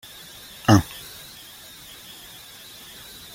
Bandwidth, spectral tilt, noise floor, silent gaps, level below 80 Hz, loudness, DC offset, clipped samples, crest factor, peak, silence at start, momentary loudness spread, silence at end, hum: 17 kHz; -5.5 dB/octave; -44 dBFS; none; -50 dBFS; -20 LUFS; under 0.1%; under 0.1%; 24 dB; -2 dBFS; 0.7 s; 22 LU; 2.5 s; none